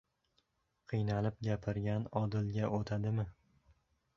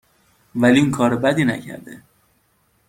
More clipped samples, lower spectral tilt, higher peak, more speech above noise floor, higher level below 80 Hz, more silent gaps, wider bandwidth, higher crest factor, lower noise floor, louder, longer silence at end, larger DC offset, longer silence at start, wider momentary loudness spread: neither; first, -8 dB/octave vs -6 dB/octave; second, -20 dBFS vs -2 dBFS; about the same, 43 dB vs 45 dB; second, -60 dBFS vs -54 dBFS; neither; second, 7 kHz vs 16 kHz; about the same, 18 dB vs 18 dB; first, -79 dBFS vs -63 dBFS; second, -37 LUFS vs -18 LUFS; about the same, 0.85 s vs 0.95 s; neither; first, 0.9 s vs 0.55 s; second, 3 LU vs 18 LU